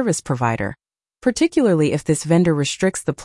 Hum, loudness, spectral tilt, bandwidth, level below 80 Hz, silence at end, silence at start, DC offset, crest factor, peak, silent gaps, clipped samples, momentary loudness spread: none; -19 LUFS; -5.5 dB/octave; 12 kHz; -50 dBFS; 0 s; 0 s; under 0.1%; 14 dB; -4 dBFS; none; under 0.1%; 7 LU